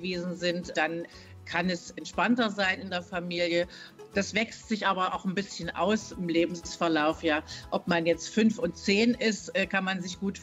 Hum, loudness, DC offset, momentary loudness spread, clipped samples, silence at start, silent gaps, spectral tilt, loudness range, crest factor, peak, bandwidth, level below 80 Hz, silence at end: none; -29 LUFS; under 0.1%; 8 LU; under 0.1%; 0 s; none; -4.5 dB/octave; 3 LU; 16 dB; -14 dBFS; 10.5 kHz; -58 dBFS; 0 s